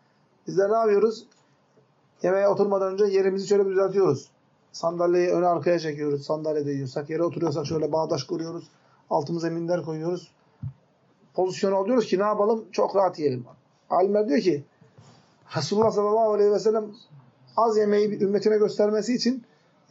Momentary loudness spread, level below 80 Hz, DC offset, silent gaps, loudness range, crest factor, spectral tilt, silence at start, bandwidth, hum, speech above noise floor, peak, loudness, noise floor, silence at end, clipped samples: 10 LU; -74 dBFS; under 0.1%; none; 5 LU; 16 dB; -5.5 dB/octave; 0.45 s; 7.6 kHz; none; 39 dB; -8 dBFS; -24 LUFS; -62 dBFS; 0.5 s; under 0.1%